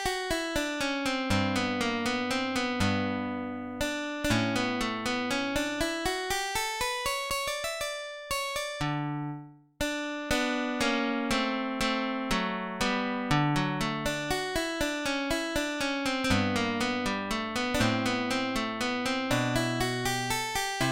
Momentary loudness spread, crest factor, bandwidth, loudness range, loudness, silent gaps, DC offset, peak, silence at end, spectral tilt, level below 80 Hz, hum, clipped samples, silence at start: 5 LU; 20 dB; 17 kHz; 2 LU; -29 LUFS; none; 0.1%; -10 dBFS; 0 s; -4 dB/octave; -48 dBFS; none; under 0.1%; 0 s